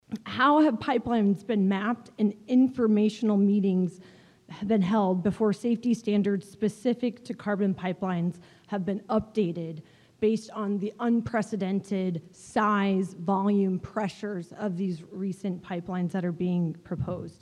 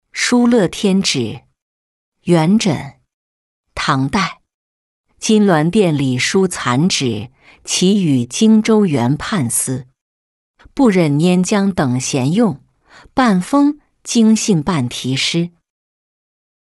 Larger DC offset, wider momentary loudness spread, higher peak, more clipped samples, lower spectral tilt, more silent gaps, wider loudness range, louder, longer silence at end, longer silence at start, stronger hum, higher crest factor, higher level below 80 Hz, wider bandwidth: neither; about the same, 10 LU vs 12 LU; second, -12 dBFS vs -2 dBFS; neither; first, -7.5 dB/octave vs -5 dB/octave; second, none vs 1.62-2.12 s, 3.14-3.64 s, 4.54-5.04 s, 10.01-10.54 s; about the same, 5 LU vs 4 LU; second, -27 LUFS vs -15 LUFS; second, 0.1 s vs 1.15 s; about the same, 0.1 s vs 0.15 s; neither; about the same, 16 dB vs 14 dB; second, -62 dBFS vs -48 dBFS; about the same, 11 kHz vs 12 kHz